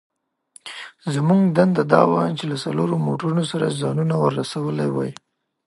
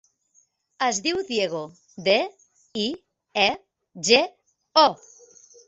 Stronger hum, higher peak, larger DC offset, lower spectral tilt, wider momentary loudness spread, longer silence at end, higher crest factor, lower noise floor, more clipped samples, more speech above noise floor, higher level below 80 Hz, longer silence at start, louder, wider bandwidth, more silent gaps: neither; about the same, -2 dBFS vs -2 dBFS; neither; first, -7 dB/octave vs -2 dB/octave; about the same, 14 LU vs 16 LU; second, 0.55 s vs 0.75 s; about the same, 20 dB vs 24 dB; second, -53 dBFS vs -65 dBFS; neither; second, 33 dB vs 42 dB; about the same, -66 dBFS vs -66 dBFS; second, 0.65 s vs 0.8 s; first, -20 LUFS vs -23 LUFS; first, 11.5 kHz vs 8.4 kHz; neither